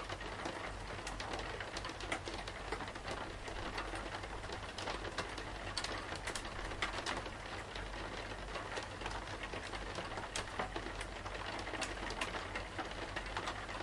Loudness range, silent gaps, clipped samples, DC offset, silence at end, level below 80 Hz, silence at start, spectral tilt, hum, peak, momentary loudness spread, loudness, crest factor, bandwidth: 2 LU; none; under 0.1%; under 0.1%; 0 s; -52 dBFS; 0 s; -3.5 dB/octave; none; -22 dBFS; 4 LU; -43 LUFS; 20 dB; 11.5 kHz